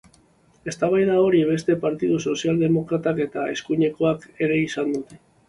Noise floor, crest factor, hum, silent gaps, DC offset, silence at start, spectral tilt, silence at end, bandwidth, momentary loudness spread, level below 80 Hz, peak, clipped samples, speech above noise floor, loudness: -57 dBFS; 14 dB; none; none; under 0.1%; 0.65 s; -6.5 dB/octave; 0.3 s; 11.5 kHz; 9 LU; -58 dBFS; -8 dBFS; under 0.1%; 36 dB; -22 LUFS